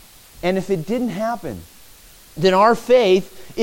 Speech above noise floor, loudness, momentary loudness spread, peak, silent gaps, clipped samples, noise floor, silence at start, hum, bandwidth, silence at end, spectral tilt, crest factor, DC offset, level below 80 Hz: 28 dB; -18 LUFS; 19 LU; -2 dBFS; none; under 0.1%; -45 dBFS; 0.45 s; none; 17 kHz; 0 s; -5.5 dB/octave; 18 dB; under 0.1%; -50 dBFS